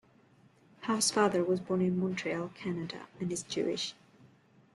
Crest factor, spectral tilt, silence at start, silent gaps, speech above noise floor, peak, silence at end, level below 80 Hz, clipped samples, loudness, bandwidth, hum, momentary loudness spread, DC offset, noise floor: 20 dB; -4 dB/octave; 0.8 s; none; 31 dB; -14 dBFS; 0.8 s; -72 dBFS; under 0.1%; -32 LUFS; 12.5 kHz; none; 11 LU; under 0.1%; -63 dBFS